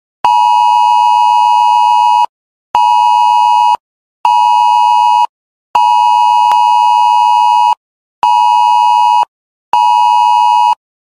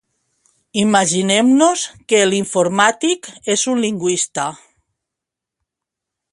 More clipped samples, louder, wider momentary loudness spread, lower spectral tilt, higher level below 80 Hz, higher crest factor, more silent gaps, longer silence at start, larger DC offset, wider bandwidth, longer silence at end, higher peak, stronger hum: neither; first, -9 LUFS vs -16 LUFS; second, 7 LU vs 10 LU; second, 1.5 dB/octave vs -3 dB/octave; about the same, -62 dBFS vs -62 dBFS; second, 10 dB vs 18 dB; first, 2.29-2.74 s, 3.80-4.24 s, 5.29-5.74 s, 7.77-8.22 s, 9.28-9.72 s vs none; second, 0.25 s vs 0.75 s; neither; first, 13 kHz vs 11.5 kHz; second, 0.35 s vs 1.75 s; about the same, 0 dBFS vs 0 dBFS; neither